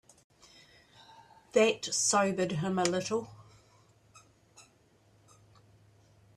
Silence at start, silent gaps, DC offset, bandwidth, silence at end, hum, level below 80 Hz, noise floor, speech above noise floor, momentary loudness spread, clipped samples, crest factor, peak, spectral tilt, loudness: 1.55 s; none; under 0.1%; 13.5 kHz; 1.75 s; none; -72 dBFS; -65 dBFS; 36 dB; 9 LU; under 0.1%; 22 dB; -12 dBFS; -3.5 dB/octave; -29 LUFS